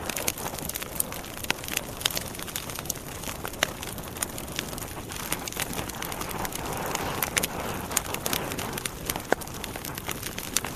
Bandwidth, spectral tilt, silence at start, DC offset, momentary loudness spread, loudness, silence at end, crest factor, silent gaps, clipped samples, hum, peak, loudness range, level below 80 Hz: 14.5 kHz; -2.5 dB/octave; 0 s; under 0.1%; 7 LU; -30 LUFS; 0 s; 32 dB; none; under 0.1%; none; 0 dBFS; 3 LU; -46 dBFS